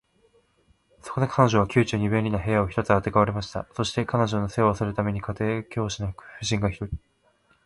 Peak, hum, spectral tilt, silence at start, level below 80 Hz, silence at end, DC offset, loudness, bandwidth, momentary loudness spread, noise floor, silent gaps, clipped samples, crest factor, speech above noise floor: -4 dBFS; none; -6 dB/octave; 1.05 s; -46 dBFS; 0.65 s; under 0.1%; -25 LUFS; 11.5 kHz; 12 LU; -64 dBFS; none; under 0.1%; 22 dB; 40 dB